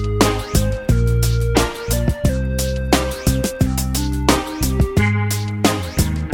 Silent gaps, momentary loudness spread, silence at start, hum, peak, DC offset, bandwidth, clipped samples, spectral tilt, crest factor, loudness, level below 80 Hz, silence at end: none; 3 LU; 0 s; none; 0 dBFS; under 0.1%; 17 kHz; under 0.1%; -5 dB/octave; 18 dB; -19 LUFS; -24 dBFS; 0 s